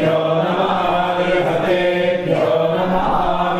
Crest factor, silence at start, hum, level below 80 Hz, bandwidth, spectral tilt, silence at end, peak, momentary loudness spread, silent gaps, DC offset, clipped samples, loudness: 14 dB; 0 s; none; -38 dBFS; 14.5 kHz; -7 dB/octave; 0 s; -4 dBFS; 1 LU; none; under 0.1%; under 0.1%; -17 LUFS